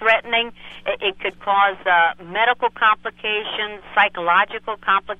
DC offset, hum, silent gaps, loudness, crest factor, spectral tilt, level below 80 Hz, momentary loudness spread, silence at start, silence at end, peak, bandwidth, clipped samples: under 0.1%; 60 Hz at -55 dBFS; none; -19 LUFS; 18 dB; -4 dB/octave; -56 dBFS; 9 LU; 0 s; 0.05 s; -2 dBFS; 7.6 kHz; under 0.1%